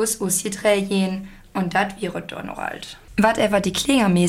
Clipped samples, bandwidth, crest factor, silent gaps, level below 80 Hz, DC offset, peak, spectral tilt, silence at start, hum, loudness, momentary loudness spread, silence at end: under 0.1%; 16 kHz; 16 dB; none; -48 dBFS; under 0.1%; -4 dBFS; -4.5 dB/octave; 0 s; none; -21 LUFS; 13 LU; 0 s